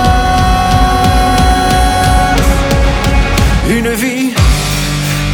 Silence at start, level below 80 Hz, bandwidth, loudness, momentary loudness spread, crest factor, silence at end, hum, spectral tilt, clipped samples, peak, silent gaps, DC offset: 0 s; -14 dBFS; 19 kHz; -11 LUFS; 4 LU; 10 dB; 0 s; none; -5 dB/octave; under 0.1%; 0 dBFS; none; under 0.1%